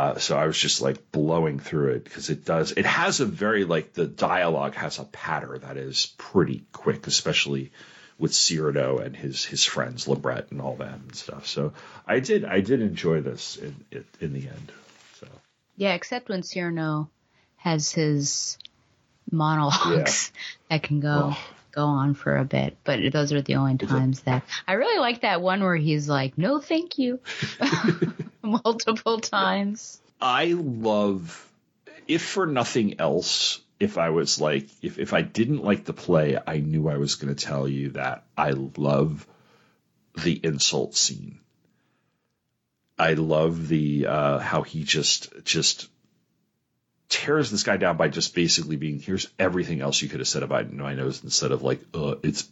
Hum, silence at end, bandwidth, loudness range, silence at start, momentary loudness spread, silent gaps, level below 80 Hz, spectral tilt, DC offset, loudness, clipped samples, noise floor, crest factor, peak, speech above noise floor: none; 0.05 s; 8.2 kHz; 4 LU; 0 s; 11 LU; none; -60 dBFS; -4 dB/octave; under 0.1%; -24 LUFS; under 0.1%; -77 dBFS; 18 dB; -6 dBFS; 52 dB